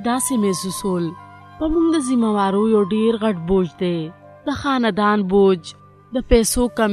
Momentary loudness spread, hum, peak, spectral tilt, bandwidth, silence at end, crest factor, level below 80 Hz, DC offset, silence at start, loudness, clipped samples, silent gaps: 11 LU; none; 0 dBFS; -5 dB/octave; 13 kHz; 0 s; 18 dB; -36 dBFS; under 0.1%; 0 s; -19 LUFS; under 0.1%; none